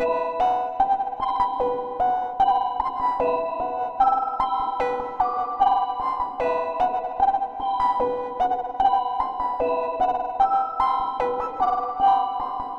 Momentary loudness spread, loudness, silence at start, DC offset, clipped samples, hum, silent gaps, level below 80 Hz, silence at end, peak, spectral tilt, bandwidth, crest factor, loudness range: 5 LU; -23 LUFS; 0 s; under 0.1%; under 0.1%; none; none; -48 dBFS; 0 s; -8 dBFS; -5.5 dB/octave; 6.2 kHz; 16 dB; 1 LU